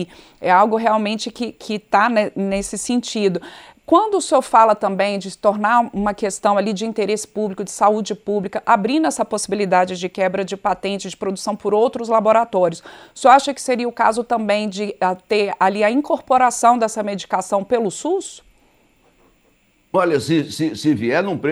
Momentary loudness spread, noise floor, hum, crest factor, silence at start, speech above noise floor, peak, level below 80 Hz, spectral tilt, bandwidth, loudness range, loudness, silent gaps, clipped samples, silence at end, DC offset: 10 LU; -59 dBFS; none; 18 dB; 0 s; 41 dB; 0 dBFS; -54 dBFS; -4.5 dB/octave; 14.5 kHz; 4 LU; -18 LUFS; none; under 0.1%; 0 s; under 0.1%